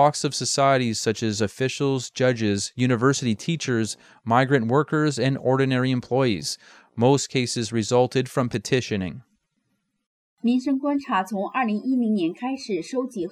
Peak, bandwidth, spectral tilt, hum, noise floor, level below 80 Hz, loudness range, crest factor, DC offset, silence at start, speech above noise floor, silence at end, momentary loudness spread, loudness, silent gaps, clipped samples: -6 dBFS; 14 kHz; -5 dB/octave; none; -73 dBFS; -64 dBFS; 4 LU; 18 dB; under 0.1%; 0 s; 51 dB; 0 s; 8 LU; -23 LUFS; 10.06-10.37 s; under 0.1%